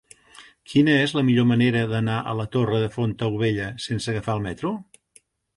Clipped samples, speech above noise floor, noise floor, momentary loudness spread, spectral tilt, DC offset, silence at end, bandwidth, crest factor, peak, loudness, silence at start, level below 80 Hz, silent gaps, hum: under 0.1%; 37 dB; -59 dBFS; 10 LU; -6.5 dB/octave; under 0.1%; 0.75 s; 11.5 kHz; 16 dB; -8 dBFS; -23 LUFS; 0.4 s; -52 dBFS; none; none